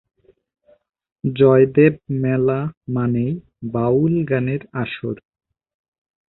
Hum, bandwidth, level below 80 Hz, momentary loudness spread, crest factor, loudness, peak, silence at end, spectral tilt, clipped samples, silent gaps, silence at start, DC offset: none; 4.1 kHz; -54 dBFS; 14 LU; 18 dB; -19 LUFS; -2 dBFS; 1.15 s; -13 dB/octave; under 0.1%; 2.77-2.81 s; 1.25 s; under 0.1%